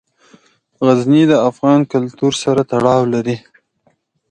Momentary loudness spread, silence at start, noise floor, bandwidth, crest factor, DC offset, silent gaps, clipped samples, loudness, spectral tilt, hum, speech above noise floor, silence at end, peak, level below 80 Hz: 8 LU; 0.8 s; -60 dBFS; 10 kHz; 14 dB; under 0.1%; none; under 0.1%; -14 LUFS; -6.5 dB/octave; none; 47 dB; 0.95 s; 0 dBFS; -56 dBFS